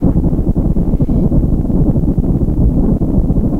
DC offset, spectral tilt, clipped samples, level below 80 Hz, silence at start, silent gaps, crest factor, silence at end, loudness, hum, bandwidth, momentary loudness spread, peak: under 0.1%; -12 dB/octave; under 0.1%; -16 dBFS; 0 s; none; 12 dB; 0 s; -14 LUFS; none; 2.1 kHz; 2 LU; 0 dBFS